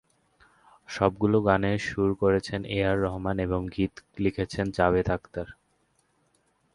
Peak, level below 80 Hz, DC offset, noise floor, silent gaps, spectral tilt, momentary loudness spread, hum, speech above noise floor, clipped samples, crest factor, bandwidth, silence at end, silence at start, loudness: -4 dBFS; -46 dBFS; under 0.1%; -69 dBFS; none; -7 dB/octave; 8 LU; none; 43 dB; under 0.1%; 22 dB; 11.5 kHz; 1.2 s; 0.9 s; -27 LUFS